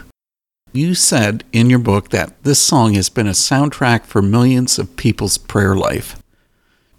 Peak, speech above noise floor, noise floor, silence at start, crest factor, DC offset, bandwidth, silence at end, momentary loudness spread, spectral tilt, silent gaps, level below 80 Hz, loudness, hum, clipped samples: 0 dBFS; 76 dB; -90 dBFS; 0.75 s; 14 dB; under 0.1%; 16.5 kHz; 0.75 s; 7 LU; -4.5 dB/octave; none; -40 dBFS; -14 LUFS; none; under 0.1%